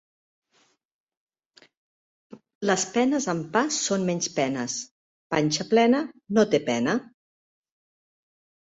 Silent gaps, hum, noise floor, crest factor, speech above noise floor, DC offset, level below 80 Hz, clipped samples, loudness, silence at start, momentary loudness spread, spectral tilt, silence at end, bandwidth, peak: 2.55-2.61 s, 4.91-5.30 s; none; -67 dBFS; 20 dB; 43 dB; under 0.1%; -68 dBFS; under 0.1%; -24 LUFS; 2.3 s; 9 LU; -4 dB/octave; 1.6 s; 8.2 kHz; -6 dBFS